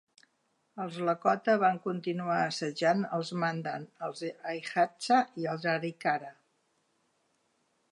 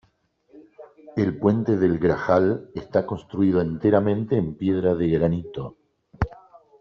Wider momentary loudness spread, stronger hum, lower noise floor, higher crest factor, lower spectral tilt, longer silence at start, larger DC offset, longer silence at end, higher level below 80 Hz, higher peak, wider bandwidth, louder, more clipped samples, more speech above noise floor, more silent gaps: about the same, 12 LU vs 10 LU; neither; first, -75 dBFS vs -64 dBFS; about the same, 20 dB vs 18 dB; second, -5.5 dB/octave vs -8 dB/octave; first, 0.75 s vs 0.55 s; neither; first, 1.6 s vs 0.45 s; second, -86 dBFS vs -46 dBFS; second, -12 dBFS vs -4 dBFS; first, 11.5 kHz vs 6.6 kHz; second, -31 LUFS vs -23 LUFS; neither; about the same, 45 dB vs 43 dB; neither